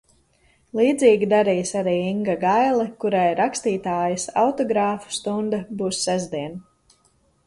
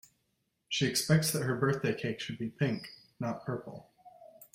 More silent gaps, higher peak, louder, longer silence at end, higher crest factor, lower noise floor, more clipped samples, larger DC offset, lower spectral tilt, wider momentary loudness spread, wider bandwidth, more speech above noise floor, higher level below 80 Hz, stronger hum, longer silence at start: neither; first, -4 dBFS vs -12 dBFS; first, -21 LUFS vs -32 LUFS; first, 0.85 s vs 0.1 s; about the same, 18 dB vs 22 dB; second, -62 dBFS vs -79 dBFS; neither; neither; about the same, -4.5 dB/octave vs -4.5 dB/octave; second, 9 LU vs 13 LU; second, 11.5 kHz vs 16 kHz; second, 41 dB vs 47 dB; first, -60 dBFS vs -68 dBFS; neither; about the same, 0.75 s vs 0.7 s